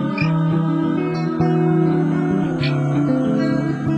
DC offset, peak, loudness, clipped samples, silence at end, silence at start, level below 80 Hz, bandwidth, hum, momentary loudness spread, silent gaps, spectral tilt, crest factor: under 0.1%; -6 dBFS; -19 LUFS; under 0.1%; 0 s; 0 s; -50 dBFS; 6.8 kHz; none; 3 LU; none; -8.5 dB/octave; 12 dB